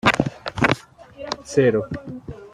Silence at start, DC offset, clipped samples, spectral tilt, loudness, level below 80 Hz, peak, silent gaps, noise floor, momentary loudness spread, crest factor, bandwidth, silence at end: 0.05 s; under 0.1%; under 0.1%; -5.5 dB/octave; -22 LUFS; -48 dBFS; -2 dBFS; none; -41 dBFS; 17 LU; 20 dB; 14 kHz; 0.05 s